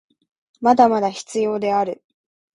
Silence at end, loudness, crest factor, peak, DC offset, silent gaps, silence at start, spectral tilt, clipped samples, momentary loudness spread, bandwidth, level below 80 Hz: 0.6 s; -19 LUFS; 20 dB; 0 dBFS; under 0.1%; none; 0.6 s; -5 dB/octave; under 0.1%; 10 LU; 11 kHz; -62 dBFS